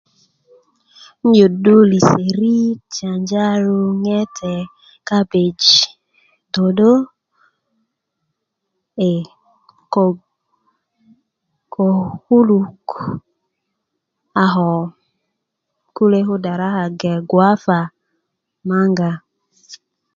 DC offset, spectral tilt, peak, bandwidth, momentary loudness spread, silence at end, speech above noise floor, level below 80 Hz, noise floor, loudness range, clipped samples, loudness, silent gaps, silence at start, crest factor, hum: under 0.1%; -5.5 dB/octave; 0 dBFS; 7.4 kHz; 16 LU; 0.4 s; 61 dB; -58 dBFS; -75 dBFS; 9 LU; under 0.1%; -15 LUFS; none; 1.25 s; 18 dB; none